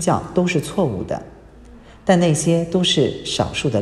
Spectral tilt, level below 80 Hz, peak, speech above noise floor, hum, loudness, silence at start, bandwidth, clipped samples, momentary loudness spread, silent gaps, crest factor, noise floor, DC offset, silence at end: -5 dB/octave; -46 dBFS; 0 dBFS; 24 dB; none; -19 LUFS; 0 s; 13 kHz; under 0.1%; 10 LU; none; 18 dB; -42 dBFS; under 0.1%; 0 s